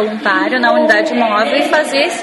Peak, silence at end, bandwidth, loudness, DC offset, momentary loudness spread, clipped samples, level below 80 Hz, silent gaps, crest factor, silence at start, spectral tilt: 0 dBFS; 0 s; 12 kHz; -12 LUFS; under 0.1%; 3 LU; under 0.1%; -62 dBFS; none; 12 dB; 0 s; -3 dB/octave